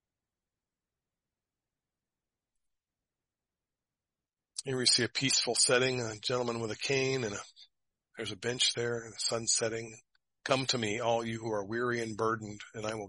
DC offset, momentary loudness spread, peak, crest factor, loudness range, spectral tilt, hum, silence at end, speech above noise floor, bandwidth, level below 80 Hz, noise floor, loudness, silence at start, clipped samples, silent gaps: under 0.1%; 15 LU; -12 dBFS; 24 dB; 4 LU; -2.5 dB/octave; none; 0 s; over 58 dB; 11.5 kHz; -70 dBFS; under -90 dBFS; -31 LUFS; 4.55 s; under 0.1%; none